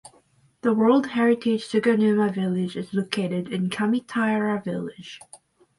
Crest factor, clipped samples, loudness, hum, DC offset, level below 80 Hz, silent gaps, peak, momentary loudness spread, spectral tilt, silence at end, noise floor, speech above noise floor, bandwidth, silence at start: 16 dB; under 0.1%; -23 LUFS; none; under 0.1%; -68 dBFS; none; -8 dBFS; 11 LU; -6.5 dB/octave; 0.4 s; -60 dBFS; 37 dB; 11.5 kHz; 0.05 s